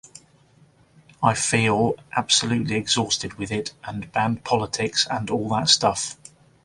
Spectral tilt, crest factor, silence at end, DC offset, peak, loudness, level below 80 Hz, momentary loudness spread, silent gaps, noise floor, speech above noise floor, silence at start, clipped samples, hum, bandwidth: -3 dB/octave; 22 dB; 0.5 s; under 0.1%; -2 dBFS; -22 LUFS; -54 dBFS; 10 LU; none; -56 dBFS; 33 dB; 0.15 s; under 0.1%; none; 11.5 kHz